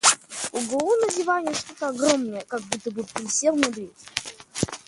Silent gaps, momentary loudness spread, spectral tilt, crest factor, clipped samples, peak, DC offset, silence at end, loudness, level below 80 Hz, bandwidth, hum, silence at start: none; 10 LU; -2 dB/octave; 24 dB; under 0.1%; 0 dBFS; under 0.1%; 0.1 s; -25 LUFS; -58 dBFS; 11.5 kHz; none; 0.05 s